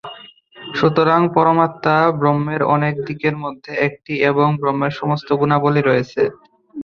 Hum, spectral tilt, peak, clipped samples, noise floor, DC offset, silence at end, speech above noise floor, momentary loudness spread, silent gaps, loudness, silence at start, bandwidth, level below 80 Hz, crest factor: none; -8 dB/octave; -2 dBFS; under 0.1%; -41 dBFS; under 0.1%; 0 s; 25 dB; 8 LU; none; -17 LUFS; 0.05 s; 6.6 kHz; -56 dBFS; 16 dB